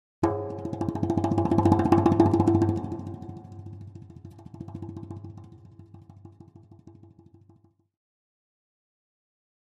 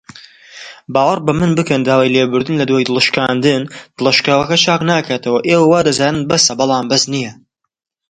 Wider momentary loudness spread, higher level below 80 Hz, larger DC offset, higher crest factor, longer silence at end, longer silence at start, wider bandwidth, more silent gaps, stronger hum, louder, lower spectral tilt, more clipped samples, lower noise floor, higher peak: first, 24 LU vs 8 LU; about the same, -54 dBFS vs -52 dBFS; neither; first, 24 dB vs 14 dB; first, 2.75 s vs 0.75 s; about the same, 0.2 s vs 0.15 s; about the same, 9.4 kHz vs 9.6 kHz; neither; neither; second, -24 LUFS vs -13 LUFS; first, -9 dB/octave vs -4 dB/octave; neither; first, -60 dBFS vs -39 dBFS; second, -6 dBFS vs 0 dBFS